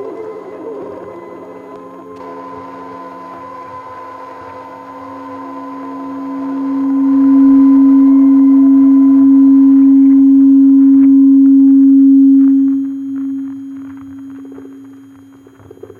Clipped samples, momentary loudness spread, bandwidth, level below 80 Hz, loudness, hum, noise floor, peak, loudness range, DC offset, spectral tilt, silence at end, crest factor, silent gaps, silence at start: under 0.1%; 23 LU; 2.3 kHz; -58 dBFS; -8 LUFS; none; -40 dBFS; -2 dBFS; 23 LU; under 0.1%; -9 dB/octave; 1.35 s; 8 dB; none; 0 s